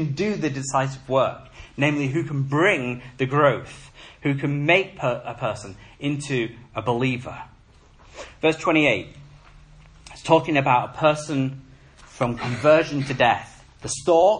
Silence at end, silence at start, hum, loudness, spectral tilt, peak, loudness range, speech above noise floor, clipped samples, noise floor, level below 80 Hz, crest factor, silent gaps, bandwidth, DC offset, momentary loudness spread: 0 s; 0 s; none; -22 LUFS; -5.5 dB/octave; -2 dBFS; 4 LU; 30 dB; under 0.1%; -52 dBFS; -52 dBFS; 20 dB; none; 10.5 kHz; under 0.1%; 18 LU